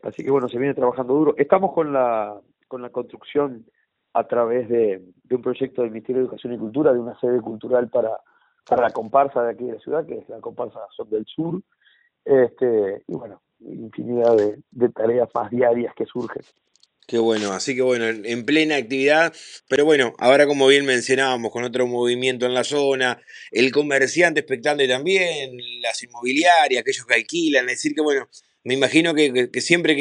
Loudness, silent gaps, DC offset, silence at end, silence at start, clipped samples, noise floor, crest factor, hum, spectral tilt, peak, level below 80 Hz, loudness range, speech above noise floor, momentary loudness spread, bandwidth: -20 LUFS; none; under 0.1%; 0 s; 0.05 s; under 0.1%; -60 dBFS; 20 dB; none; -4 dB/octave; 0 dBFS; -68 dBFS; 6 LU; 40 dB; 14 LU; 10.5 kHz